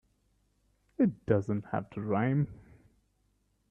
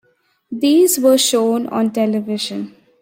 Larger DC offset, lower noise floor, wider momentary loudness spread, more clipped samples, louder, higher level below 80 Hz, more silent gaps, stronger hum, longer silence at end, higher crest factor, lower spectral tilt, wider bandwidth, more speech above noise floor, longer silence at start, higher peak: neither; first, -73 dBFS vs -57 dBFS; second, 8 LU vs 14 LU; neither; second, -31 LUFS vs -16 LUFS; about the same, -62 dBFS vs -66 dBFS; neither; first, 50 Hz at -50 dBFS vs none; first, 1.15 s vs 0.35 s; first, 22 dB vs 14 dB; first, -10 dB/octave vs -3.5 dB/octave; second, 7.4 kHz vs 16.5 kHz; about the same, 43 dB vs 42 dB; first, 1 s vs 0.5 s; second, -12 dBFS vs -2 dBFS